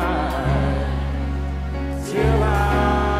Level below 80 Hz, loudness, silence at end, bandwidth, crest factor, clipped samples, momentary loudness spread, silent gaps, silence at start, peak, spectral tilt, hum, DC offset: -24 dBFS; -22 LUFS; 0 s; 14 kHz; 14 dB; under 0.1%; 8 LU; none; 0 s; -6 dBFS; -7 dB/octave; none; under 0.1%